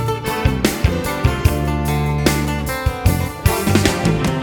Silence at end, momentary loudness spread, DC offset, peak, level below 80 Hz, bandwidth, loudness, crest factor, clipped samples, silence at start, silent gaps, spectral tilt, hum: 0 s; 4 LU; under 0.1%; 0 dBFS; -24 dBFS; 19.5 kHz; -18 LUFS; 16 dB; under 0.1%; 0 s; none; -5.5 dB/octave; none